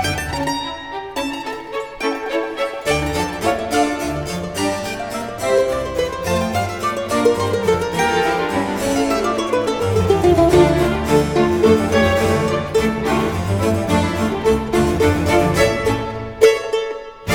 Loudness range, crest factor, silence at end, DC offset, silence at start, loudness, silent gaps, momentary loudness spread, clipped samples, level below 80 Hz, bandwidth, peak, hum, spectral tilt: 6 LU; 18 dB; 0 s; under 0.1%; 0 s; -18 LUFS; none; 10 LU; under 0.1%; -36 dBFS; 19 kHz; 0 dBFS; none; -5.5 dB/octave